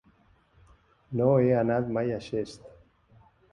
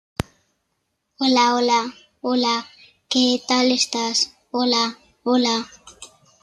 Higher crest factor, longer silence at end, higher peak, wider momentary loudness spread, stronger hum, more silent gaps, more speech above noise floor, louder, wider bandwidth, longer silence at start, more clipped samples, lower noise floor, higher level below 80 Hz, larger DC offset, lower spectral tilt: about the same, 18 dB vs 18 dB; first, 0.85 s vs 0.35 s; second, -10 dBFS vs -4 dBFS; about the same, 14 LU vs 14 LU; neither; neither; second, 37 dB vs 54 dB; second, -27 LUFS vs -20 LUFS; second, 10 kHz vs 12 kHz; first, 1.1 s vs 0.2 s; neither; second, -63 dBFS vs -74 dBFS; second, -60 dBFS vs -54 dBFS; neither; first, -8.5 dB/octave vs -2.5 dB/octave